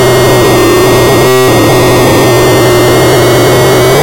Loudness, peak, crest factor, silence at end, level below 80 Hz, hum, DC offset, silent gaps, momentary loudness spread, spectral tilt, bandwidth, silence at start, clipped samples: -5 LUFS; 0 dBFS; 4 dB; 0 s; -24 dBFS; none; under 0.1%; none; 0 LU; -5 dB/octave; 17 kHz; 0 s; under 0.1%